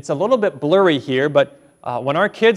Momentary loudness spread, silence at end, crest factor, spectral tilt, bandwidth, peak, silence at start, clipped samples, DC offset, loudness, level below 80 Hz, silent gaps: 9 LU; 0 s; 16 dB; -6 dB/octave; 11 kHz; -2 dBFS; 0.05 s; under 0.1%; under 0.1%; -17 LUFS; -64 dBFS; none